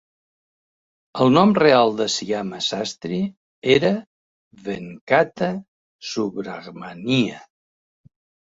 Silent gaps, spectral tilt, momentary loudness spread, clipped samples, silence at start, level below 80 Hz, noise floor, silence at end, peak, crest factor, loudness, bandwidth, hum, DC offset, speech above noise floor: 3.37-3.62 s, 4.07-4.51 s, 5.01-5.07 s, 5.68-5.99 s; -5 dB/octave; 18 LU; under 0.1%; 1.15 s; -60 dBFS; under -90 dBFS; 1.05 s; -2 dBFS; 20 dB; -20 LUFS; 8 kHz; none; under 0.1%; over 70 dB